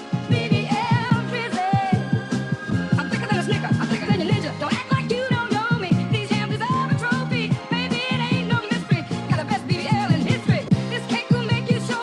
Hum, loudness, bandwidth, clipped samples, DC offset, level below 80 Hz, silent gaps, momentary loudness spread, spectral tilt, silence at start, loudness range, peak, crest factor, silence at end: none; -22 LUFS; 11 kHz; under 0.1%; under 0.1%; -52 dBFS; none; 4 LU; -6.5 dB/octave; 0 s; 1 LU; -6 dBFS; 16 dB; 0 s